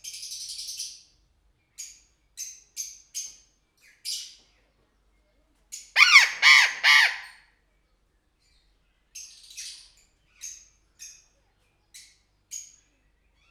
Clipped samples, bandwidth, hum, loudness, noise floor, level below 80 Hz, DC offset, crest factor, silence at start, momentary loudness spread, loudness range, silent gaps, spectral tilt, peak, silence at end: under 0.1%; over 20 kHz; none; -18 LUFS; -69 dBFS; -70 dBFS; under 0.1%; 26 dB; 0.05 s; 28 LU; 25 LU; none; 4.5 dB/octave; -2 dBFS; 0.9 s